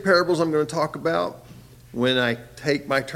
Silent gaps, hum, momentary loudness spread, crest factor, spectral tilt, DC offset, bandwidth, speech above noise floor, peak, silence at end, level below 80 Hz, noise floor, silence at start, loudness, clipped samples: none; none; 8 LU; 18 dB; -5 dB/octave; under 0.1%; 16 kHz; 23 dB; -6 dBFS; 0 s; -56 dBFS; -45 dBFS; 0 s; -23 LUFS; under 0.1%